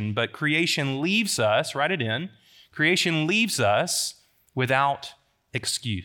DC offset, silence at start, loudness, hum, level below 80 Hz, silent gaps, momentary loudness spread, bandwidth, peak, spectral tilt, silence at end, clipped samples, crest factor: under 0.1%; 0 s; -24 LUFS; none; -70 dBFS; none; 11 LU; 19 kHz; -6 dBFS; -3.5 dB/octave; 0 s; under 0.1%; 18 dB